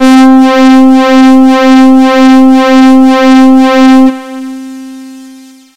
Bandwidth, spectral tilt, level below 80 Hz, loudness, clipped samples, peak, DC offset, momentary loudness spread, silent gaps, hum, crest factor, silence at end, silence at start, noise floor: 10.5 kHz; -4 dB/octave; -44 dBFS; -3 LUFS; 20%; 0 dBFS; 4%; 17 LU; none; none; 4 dB; 0.4 s; 0 s; -32 dBFS